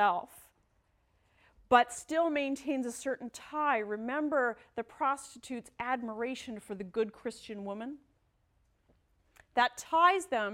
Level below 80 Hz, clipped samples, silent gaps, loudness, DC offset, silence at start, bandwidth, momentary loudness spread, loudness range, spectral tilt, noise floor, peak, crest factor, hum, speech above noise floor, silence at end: -70 dBFS; under 0.1%; none; -32 LUFS; under 0.1%; 0 s; 16.5 kHz; 16 LU; 7 LU; -3.5 dB/octave; -73 dBFS; -10 dBFS; 24 dB; none; 40 dB; 0 s